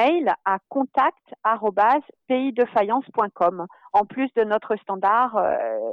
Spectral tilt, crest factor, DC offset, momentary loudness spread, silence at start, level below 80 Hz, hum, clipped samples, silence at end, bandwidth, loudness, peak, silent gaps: -7 dB/octave; 14 dB; under 0.1%; 5 LU; 0 s; -66 dBFS; none; under 0.1%; 0 s; 6.6 kHz; -22 LUFS; -8 dBFS; none